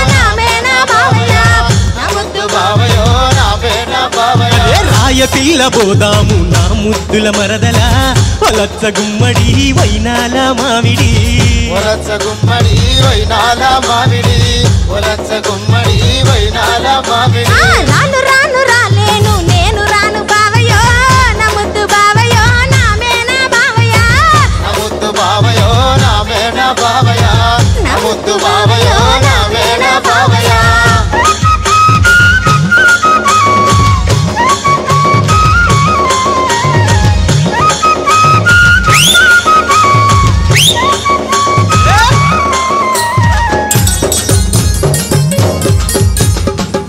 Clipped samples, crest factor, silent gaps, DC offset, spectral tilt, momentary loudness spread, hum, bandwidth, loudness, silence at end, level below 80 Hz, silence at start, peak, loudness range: under 0.1%; 8 dB; none; under 0.1%; -4 dB/octave; 5 LU; none; 16.5 kHz; -8 LUFS; 0 s; -18 dBFS; 0 s; 0 dBFS; 3 LU